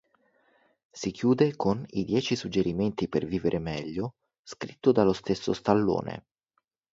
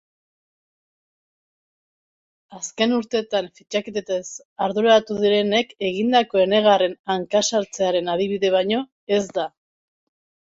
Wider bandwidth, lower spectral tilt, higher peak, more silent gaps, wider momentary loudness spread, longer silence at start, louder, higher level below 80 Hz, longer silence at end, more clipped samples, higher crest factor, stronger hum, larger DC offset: about the same, 7.8 kHz vs 8 kHz; first, -6.5 dB/octave vs -3.5 dB/octave; about the same, -6 dBFS vs -4 dBFS; second, 4.39-4.44 s vs 4.45-4.56 s, 6.99-7.04 s, 8.92-9.07 s; first, 13 LU vs 10 LU; second, 0.95 s vs 2.5 s; second, -28 LUFS vs -21 LUFS; first, -56 dBFS vs -66 dBFS; second, 0.7 s vs 0.95 s; neither; about the same, 22 dB vs 18 dB; neither; neither